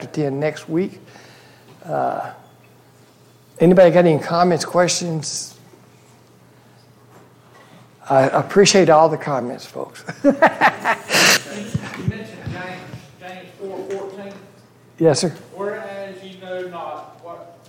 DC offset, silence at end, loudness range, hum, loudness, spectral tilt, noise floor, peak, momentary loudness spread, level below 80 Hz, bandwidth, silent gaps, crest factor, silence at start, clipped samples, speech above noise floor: under 0.1%; 0.15 s; 10 LU; none; -17 LUFS; -4 dB/octave; -50 dBFS; -2 dBFS; 22 LU; -58 dBFS; 17 kHz; none; 18 dB; 0 s; under 0.1%; 33 dB